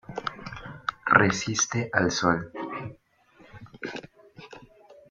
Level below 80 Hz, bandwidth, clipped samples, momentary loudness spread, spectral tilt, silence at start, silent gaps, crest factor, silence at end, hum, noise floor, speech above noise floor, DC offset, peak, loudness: -58 dBFS; 9.4 kHz; under 0.1%; 21 LU; -3.5 dB/octave; 0.1 s; none; 26 dB; 0.2 s; none; -59 dBFS; 34 dB; under 0.1%; -2 dBFS; -26 LUFS